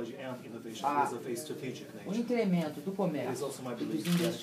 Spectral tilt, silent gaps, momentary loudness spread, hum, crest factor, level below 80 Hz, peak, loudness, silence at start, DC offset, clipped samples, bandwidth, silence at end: -6 dB/octave; none; 11 LU; none; 18 dB; -80 dBFS; -16 dBFS; -35 LUFS; 0 s; under 0.1%; under 0.1%; 15.5 kHz; 0 s